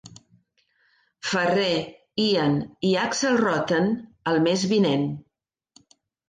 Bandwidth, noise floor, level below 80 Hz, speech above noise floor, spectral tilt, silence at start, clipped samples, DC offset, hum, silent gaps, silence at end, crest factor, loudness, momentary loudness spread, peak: 9.6 kHz; -77 dBFS; -62 dBFS; 55 dB; -5 dB/octave; 0.05 s; under 0.1%; under 0.1%; none; none; 1.1 s; 14 dB; -23 LUFS; 8 LU; -10 dBFS